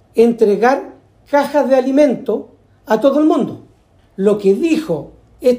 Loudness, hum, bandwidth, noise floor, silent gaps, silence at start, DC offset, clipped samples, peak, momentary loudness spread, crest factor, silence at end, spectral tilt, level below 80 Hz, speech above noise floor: -15 LUFS; none; 15.5 kHz; -51 dBFS; none; 0.15 s; under 0.1%; under 0.1%; -2 dBFS; 11 LU; 14 dB; 0 s; -6.5 dB/octave; -54 dBFS; 37 dB